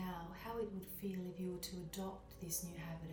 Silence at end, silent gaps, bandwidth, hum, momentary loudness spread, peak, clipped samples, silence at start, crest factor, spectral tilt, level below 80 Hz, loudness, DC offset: 0 s; none; 19 kHz; none; 6 LU; -28 dBFS; under 0.1%; 0 s; 18 dB; -4.5 dB/octave; -62 dBFS; -46 LUFS; under 0.1%